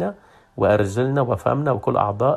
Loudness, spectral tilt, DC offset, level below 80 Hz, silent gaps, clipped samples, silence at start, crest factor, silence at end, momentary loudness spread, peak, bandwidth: -21 LUFS; -8 dB/octave; under 0.1%; -52 dBFS; none; under 0.1%; 0 s; 16 dB; 0 s; 5 LU; -4 dBFS; 13 kHz